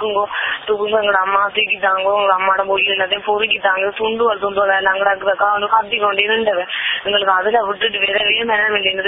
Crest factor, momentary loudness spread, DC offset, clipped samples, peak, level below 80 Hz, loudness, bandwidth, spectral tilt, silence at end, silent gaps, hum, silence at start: 16 dB; 4 LU; under 0.1%; under 0.1%; 0 dBFS; -56 dBFS; -15 LUFS; 4 kHz; -7.5 dB/octave; 0 s; none; none; 0 s